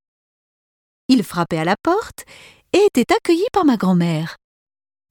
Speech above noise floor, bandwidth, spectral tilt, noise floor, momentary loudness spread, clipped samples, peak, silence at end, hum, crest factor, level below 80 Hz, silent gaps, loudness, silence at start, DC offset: over 73 dB; 18.5 kHz; -6 dB/octave; under -90 dBFS; 13 LU; under 0.1%; -2 dBFS; 0.75 s; none; 18 dB; -54 dBFS; none; -18 LUFS; 1.1 s; under 0.1%